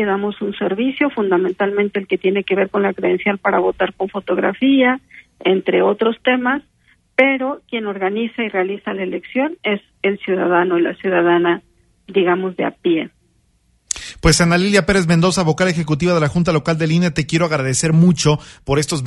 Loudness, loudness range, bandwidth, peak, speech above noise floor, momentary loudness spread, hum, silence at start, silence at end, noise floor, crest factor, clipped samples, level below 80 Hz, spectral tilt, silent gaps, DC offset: -17 LUFS; 4 LU; 11.5 kHz; 0 dBFS; 43 dB; 8 LU; none; 0 s; 0 s; -59 dBFS; 18 dB; under 0.1%; -40 dBFS; -5.5 dB/octave; none; under 0.1%